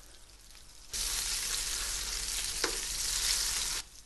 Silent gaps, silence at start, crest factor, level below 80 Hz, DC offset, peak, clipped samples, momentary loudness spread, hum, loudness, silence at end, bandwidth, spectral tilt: none; 0 s; 22 dB; -48 dBFS; under 0.1%; -14 dBFS; under 0.1%; 6 LU; none; -31 LUFS; 0 s; 12.5 kHz; 0.5 dB/octave